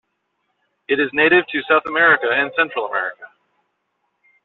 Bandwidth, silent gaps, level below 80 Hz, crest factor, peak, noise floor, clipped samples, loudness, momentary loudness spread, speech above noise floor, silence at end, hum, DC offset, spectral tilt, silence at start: 4.3 kHz; none; -62 dBFS; 16 dB; -4 dBFS; -71 dBFS; under 0.1%; -17 LUFS; 9 LU; 54 dB; 1.2 s; none; under 0.1%; -1 dB/octave; 0.9 s